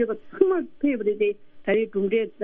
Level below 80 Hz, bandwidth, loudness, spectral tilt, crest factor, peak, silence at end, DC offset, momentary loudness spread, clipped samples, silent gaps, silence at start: -62 dBFS; 3.7 kHz; -24 LUFS; -5.5 dB/octave; 20 dB; -4 dBFS; 0 s; under 0.1%; 4 LU; under 0.1%; none; 0 s